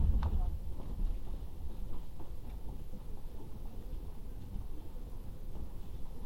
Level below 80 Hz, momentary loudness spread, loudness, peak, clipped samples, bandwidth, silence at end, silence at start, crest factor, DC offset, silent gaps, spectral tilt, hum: -38 dBFS; 10 LU; -45 LUFS; -18 dBFS; under 0.1%; 16 kHz; 0 s; 0 s; 18 dB; 0.3%; none; -8 dB/octave; none